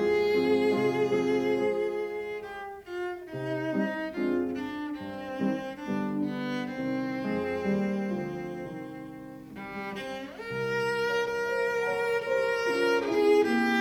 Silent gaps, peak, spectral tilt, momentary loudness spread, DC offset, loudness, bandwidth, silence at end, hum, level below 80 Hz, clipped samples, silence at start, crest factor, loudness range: none; -14 dBFS; -6 dB/octave; 13 LU; under 0.1%; -29 LUFS; 17 kHz; 0 s; none; -64 dBFS; under 0.1%; 0 s; 16 dB; 6 LU